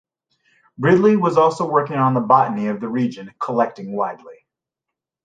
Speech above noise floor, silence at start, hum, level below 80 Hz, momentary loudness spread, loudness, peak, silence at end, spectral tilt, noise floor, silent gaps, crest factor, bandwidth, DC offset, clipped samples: 66 dB; 0.8 s; none; -62 dBFS; 10 LU; -18 LUFS; -2 dBFS; 0.9 s; -8 dB/octave; -84 dBFS; none; 18 dB; 9.2 kHz; under 0.1%; under 0.1%